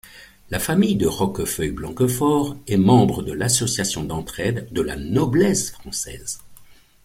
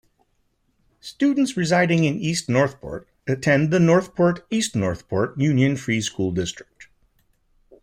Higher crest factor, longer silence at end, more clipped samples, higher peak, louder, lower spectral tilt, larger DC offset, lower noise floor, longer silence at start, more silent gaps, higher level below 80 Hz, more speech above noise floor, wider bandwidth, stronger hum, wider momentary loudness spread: about the same, 18 dB vs 16 dB; second, 0.3 s vs 1 s; neither; about the same, -4 dBFS vs -6 dBFS; about the same, -21 LUFS vs -21 LUFS; about the same, -5 dB/octave vs -5.5 dB/octave; neither; second, -47 dBFS vs -67 dBFS; second, 0.05 s vs 1.05 s; neither; first, -44 dBFS vs -54 dBFS; second, 27 dB vs 47 dB; first, 16.5 kHz vs 14.5 kHz; neither; about the same, 11 LU vs 13 LU